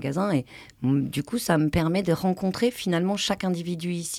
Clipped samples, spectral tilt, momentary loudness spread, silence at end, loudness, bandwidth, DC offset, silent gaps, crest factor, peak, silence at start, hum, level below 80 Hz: under 0.1%; -5.5 dB/octave; 6 LU; 0 s; -25 LUFS; 16 kHz; under 0.1%; none; 16 dB; -8 dBFS; 0 s; none; -50 dBFS